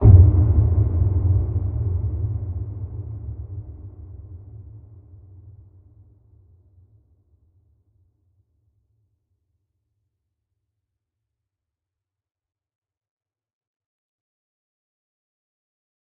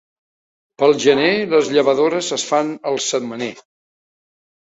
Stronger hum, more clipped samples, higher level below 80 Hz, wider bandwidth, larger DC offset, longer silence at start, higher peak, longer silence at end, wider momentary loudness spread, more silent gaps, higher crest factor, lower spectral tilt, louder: neither; neither; first, -32 dBFS vs -64 dBFS; second, 1.5 kHz vs 8.2 kHz; neither; second, 0 s vs 0.8 s; about the same, 0 dBFS vs -2 dBFS; first, 10.65 s vs 1.15 s; first, 25 LU vs 9 LU; neither; first, 24 dB vs 18 dB; first, -14.5 dB/octave vs -3.5 dB/octave; second, -21 LUFS vs -17 LUFS